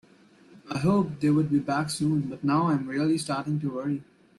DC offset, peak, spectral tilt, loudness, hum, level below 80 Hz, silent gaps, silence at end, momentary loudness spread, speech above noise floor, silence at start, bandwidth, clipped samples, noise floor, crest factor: under 0.1%; -12 dBFS; -6.5 dB/octave; -27 LUFS; none; -62 dBFS; none; 0.35 s; 7 LU; 30 dB; 0.55 s; 12.5 kHz; under 0.1%; -56 dBFS; 14 dB